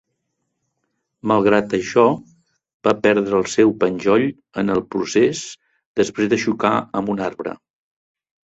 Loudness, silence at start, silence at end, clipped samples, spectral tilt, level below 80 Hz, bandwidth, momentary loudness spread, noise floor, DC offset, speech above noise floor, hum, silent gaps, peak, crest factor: -19 LUFS; 1.25 s; 0.9 s; under 0.1%; -5.5 dB/octave; -56 dBFS; 8.2 kHz; 12 LU; -75 dBFS; under 0.1%; 56 dB; none; 2.74-2.80 s, 5.86-5.95 s; -2 dBFS; 18 dB